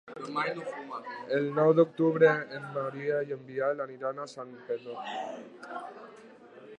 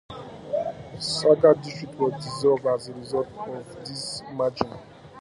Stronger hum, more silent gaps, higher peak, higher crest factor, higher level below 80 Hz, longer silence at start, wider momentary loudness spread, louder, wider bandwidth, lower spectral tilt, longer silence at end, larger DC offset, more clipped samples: neither; neither; second, -10 dBFS vs -4 dBFS; about the same, 20 dB vs 22 dB; second, -82 dBFS vs -58 dBFS; about the same, 0.05 s vs 0.1 s; about the same, 18 LU vs 17 LU; second, -30 LUFS vs -25 LUFS; second, 9 kHz vs 11.5 kHz; first, -7 dB/octave vs -5 dB/octave; about the same, 0 s vs 0 s; neither; neither